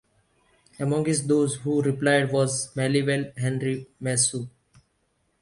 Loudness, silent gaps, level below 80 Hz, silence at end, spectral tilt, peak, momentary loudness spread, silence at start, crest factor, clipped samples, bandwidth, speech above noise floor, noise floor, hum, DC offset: -24 LUFS; none; -62 dBFS; 0.95 s; -4.5 dB/octave; -8 dBFS; 9 LU; 0.8 s; 18 dB; under 0.1%; 11.5 kHz; 47 dB; -71 dBFS; none; under 0.1%